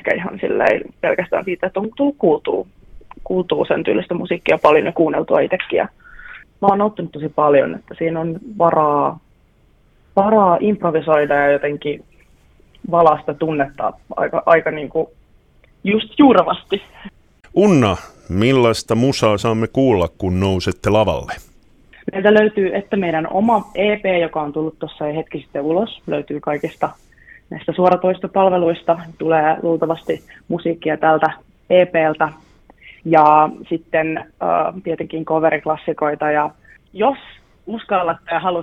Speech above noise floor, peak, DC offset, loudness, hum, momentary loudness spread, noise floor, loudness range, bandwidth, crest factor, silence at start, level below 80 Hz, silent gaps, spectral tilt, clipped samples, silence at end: 37 dB; 0 dBFS; under 0.1%; -17 LUFS; none; 12 LU; -54 dBFS; 4 LU; 13 kHz; 18 dB; 0.05 s; -48 dBFS; none; -6.5 dB/octave; under 0.1%; 0 s